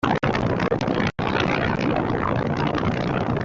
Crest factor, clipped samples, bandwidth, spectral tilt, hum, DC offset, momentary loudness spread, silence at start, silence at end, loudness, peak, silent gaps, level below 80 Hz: 16 dB; under 0.1%; 7.6 kHz; -7 dB/octave; none; under 0.1%; 2 LU; 0.05 s; 0 s; -23 LUFS; -6 dBFS; none; -42 dBFS